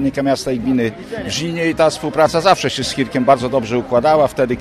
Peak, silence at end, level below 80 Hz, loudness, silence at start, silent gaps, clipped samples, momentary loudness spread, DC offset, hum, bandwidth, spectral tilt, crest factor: 0 dBFS; 0 s; -44 dBFS; -16 LUFS; 0 s; none; under 0.1%; 7 LU; under 0.1%; none; 14 kHz; -5 dB/octave; 16 dB